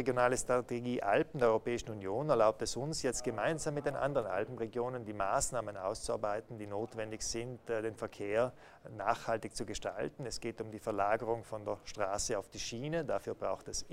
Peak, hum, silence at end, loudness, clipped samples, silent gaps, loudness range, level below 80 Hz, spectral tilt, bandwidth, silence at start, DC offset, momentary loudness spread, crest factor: -14 dBFS; none; 0 s; -36 LUFS; under 0.1%; none; 5 LU; -58 dBFS; -4 dB/octave; 16 kHz; 0 s; under 0.1%; 10 LU; 22 dB